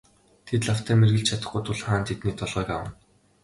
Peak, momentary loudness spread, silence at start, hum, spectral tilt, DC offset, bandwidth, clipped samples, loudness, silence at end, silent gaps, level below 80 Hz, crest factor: -8 dBFS; 10 LU; 0.45 s; none; -5.5 dB/octave; under 0.1%; 11.5 kHz; under 0.1%; -25 LUFS; 0.5 s; none; -48 dBFS; 18 dB